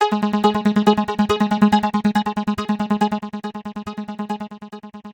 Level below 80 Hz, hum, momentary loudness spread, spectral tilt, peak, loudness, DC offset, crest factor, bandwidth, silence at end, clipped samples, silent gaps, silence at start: -50 dBFS; none; 14 LU; -6.5 dB/octave; -2 dBFS; -20 LUFS; under 0.1%; 18 dB; 17 kHz; 0 s; under 0.1%; none; 0 s